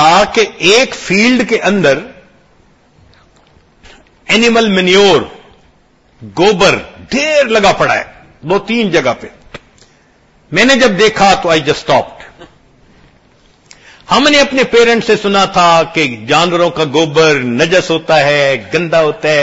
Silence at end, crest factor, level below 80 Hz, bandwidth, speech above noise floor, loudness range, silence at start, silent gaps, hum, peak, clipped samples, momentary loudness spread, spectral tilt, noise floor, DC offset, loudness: 0 s; 12 dB; -42 dBFS; 11 kHz; 39 dB; 5 LU; 0 s; none; none; 0 dBFS; 0.1%; 8 LU; -4 dB/octave; -49 dBFS; under 0.1%; -10 LUFS